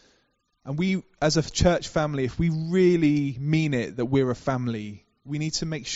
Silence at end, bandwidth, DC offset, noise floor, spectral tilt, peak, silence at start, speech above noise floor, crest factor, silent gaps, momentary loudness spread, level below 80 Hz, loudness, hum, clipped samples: 0 s; 8 kHz; under 0.1%; -70 dBFS; -6 dB/octave; -8 dBFS; 0.65 s; 45 dB; 18 dB; none; 10 LU; -44 dBFS; -25 LUFS; none; under 0.1%